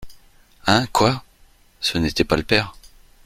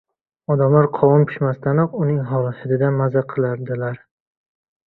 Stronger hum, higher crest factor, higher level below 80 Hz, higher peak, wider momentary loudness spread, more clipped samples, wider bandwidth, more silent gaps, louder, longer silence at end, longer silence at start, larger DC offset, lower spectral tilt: neither; about the same, 22 dB vs 18 dB; first, -42 dBFS vs -56 dBFS; about the same, 0 dBFS vs -2 dBFS; about the same, 8 LU vs 10 LU; neither; first, 16 kHz vs 4.1 kHz; neither; about the same, -20 LUFS vs -19 LUFS; second, 0.55 s vs 0.9 s; second, 0 s vs 0.5 s; neither; second, -4.5 dB/octave vs -13 dB/octave